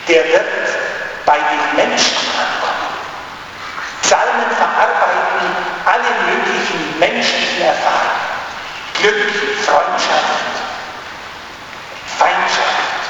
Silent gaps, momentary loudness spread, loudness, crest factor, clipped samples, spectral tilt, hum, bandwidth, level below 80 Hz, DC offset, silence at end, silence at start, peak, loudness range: none; 14 LU; -15 LUFS; 16 dB; under 0.1%; -1.5 dB/octave; none; 20 kHz; -54 dBFS; under 0.1%; 0 s; 0 s; 0 dBFS; 2 LU